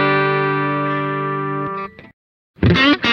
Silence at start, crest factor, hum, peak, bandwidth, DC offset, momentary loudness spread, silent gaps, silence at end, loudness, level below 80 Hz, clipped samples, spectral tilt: 0 s; 16 dB; none; -2 dBFS; 6.8 kHz; under 0.1%; 12 LU; 2.13-2.54 s; 0 s; -18 LUFS; -40 dBFS; under 0.1%; -7 dB/octave